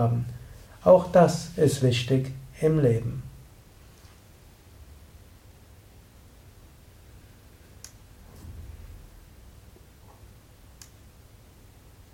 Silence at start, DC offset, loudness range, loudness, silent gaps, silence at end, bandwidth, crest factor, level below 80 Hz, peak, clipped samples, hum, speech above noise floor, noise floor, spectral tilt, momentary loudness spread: 0 s; under 0.1%; 26 LU; -23 LUFS; none; 3.15 s; 16.5 kHz; 24 dB; -50 dBFS; -4 dBFS; under 0.1%; none; 31 dB; -52 dBFS; -6.5 dB/octave; 28 LU